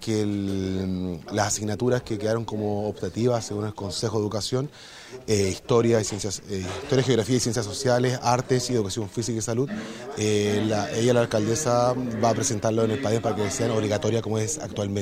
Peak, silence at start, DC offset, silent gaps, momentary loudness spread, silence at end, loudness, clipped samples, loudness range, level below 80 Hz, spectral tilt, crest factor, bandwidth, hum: -6 dBFS; 0 s; under 0.1%; none; 8 LU; 0 s; -25 LUFS; under 0.1%; 3 LU; -54 dBFS; -5 dB/octave; 18 dB; 16 kHz; none